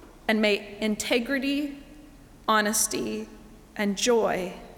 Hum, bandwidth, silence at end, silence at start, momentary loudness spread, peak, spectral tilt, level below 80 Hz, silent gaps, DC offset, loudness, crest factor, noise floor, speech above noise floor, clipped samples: none; 20 kHz; 0.05 s; 0 s; 13 LU; -10 dBFS; -3 dB/octave; -54 dBFS; none; under 0.1%; -26 LUFS; 18 dB; -49 dBFS; 23 dB; under 0.1%